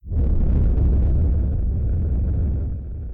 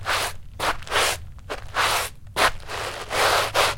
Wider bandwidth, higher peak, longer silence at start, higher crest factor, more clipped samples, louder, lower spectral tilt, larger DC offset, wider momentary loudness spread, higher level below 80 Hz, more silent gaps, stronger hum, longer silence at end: second, 1.9 kHz vs 17 kHz; second, -12 dBFS vs -4 dBFS; about the same, 0.05 s vs 0 s; second, 6 dB vs 20 dB; neither; about the same, -22 LUFS vs -23 LUFS; first, -13 dB/octave vs -1.5 dB/octave; second, under 0.1% vs 0.2%; second, 6 LU vs 11 LU; first, -20 dBFS vs -42 dBFS; neither; neither; about the same, 0 s vs 0 s